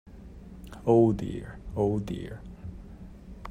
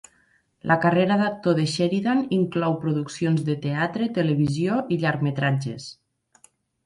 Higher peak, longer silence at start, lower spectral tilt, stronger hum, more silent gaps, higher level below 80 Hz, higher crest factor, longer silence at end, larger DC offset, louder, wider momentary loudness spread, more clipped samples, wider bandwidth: second, -10 dBFS vs -6 dBFS; second, 0.05 s vs 0.65 s; first, -9 dB/octave vs -6.5 dB/octave; neither; neither; first, -46 dBFS vs -60 dBFS; about the same, 20 dB vs 18 dB; second, 0 s vs 0.95 s; neither; second, -28 LUFS vs -23 LUFS; first, 25 LU vs 6 LU; neither; second, 10 kHz vs 11.5 kHz